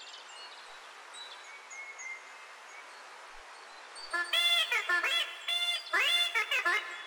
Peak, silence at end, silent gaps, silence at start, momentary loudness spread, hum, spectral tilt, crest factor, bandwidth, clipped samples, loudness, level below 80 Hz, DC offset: -18 dBFS; 0 s; none; 0 s; 22 LU; none; 3 dB/octave; 16 dB; over 20 kHz; under 0.1%; -28 LUFS; -74 dBFS; under 0.1%